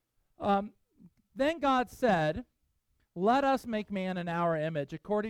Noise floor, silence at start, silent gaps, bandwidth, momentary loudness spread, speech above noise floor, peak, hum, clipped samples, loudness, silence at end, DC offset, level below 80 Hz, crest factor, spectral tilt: -75 dBFS; 0.4 s; none; 16.5 kHz; 10 LU; 45 dB; -14 dBFS; none; under 0.1%; -31 LUFS; 0 s; under 0.1%; -60 dBFS; 18 dB; -6.5 dB/octave